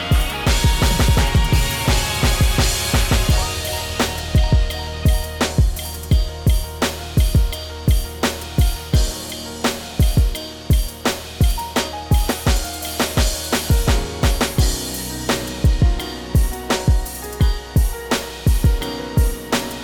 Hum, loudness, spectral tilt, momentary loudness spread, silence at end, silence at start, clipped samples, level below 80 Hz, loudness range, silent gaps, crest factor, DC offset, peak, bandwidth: none; -20 LUFS; -4.5 dB/octave; 6 LU; 0 s; 0 s; under 0.1%; -20 dBFS; 3 LU; none; 12 dB; under 0.1%; -6 dBFS; 19 kHz